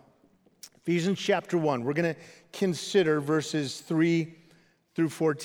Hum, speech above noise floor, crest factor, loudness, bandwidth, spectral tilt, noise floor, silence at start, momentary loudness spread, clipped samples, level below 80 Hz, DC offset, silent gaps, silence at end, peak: none; 37 dB; 18 dB; -28 LUFS; 17 kHz; -5.5 dB/octave; -64 dBFS; 0.65 s; 12 LU; under 0.1%; -76 dBFS; under 0.1%; none; 0 s; -12 dBFS